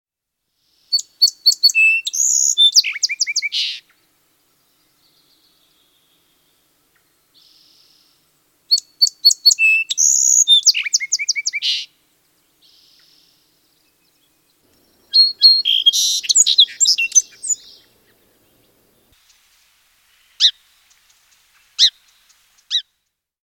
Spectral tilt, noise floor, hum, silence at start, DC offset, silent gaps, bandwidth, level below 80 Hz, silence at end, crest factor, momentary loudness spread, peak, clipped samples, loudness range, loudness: 7 dB/octave; -77 dBFS; none; 0.9 s; under 0.1%; none; 17 kHz; -76 dBFS; 0.6 s; 20 dB; 12 LU; 0 dBFS; under 0.1%; 12 LU; -13 LUFS